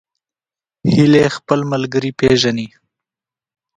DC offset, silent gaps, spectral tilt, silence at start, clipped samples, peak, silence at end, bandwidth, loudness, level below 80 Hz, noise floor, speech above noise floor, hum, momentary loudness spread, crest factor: under 0.1%; none; -6 dB/octave; 0.85 s; under 0.1%; 0 dBFS; 1.1 s; 10.5 kHz; -15 LUFS; -46 dBFS; under -90 dBFS; over 76 dB; none; 11 LU; 16 dB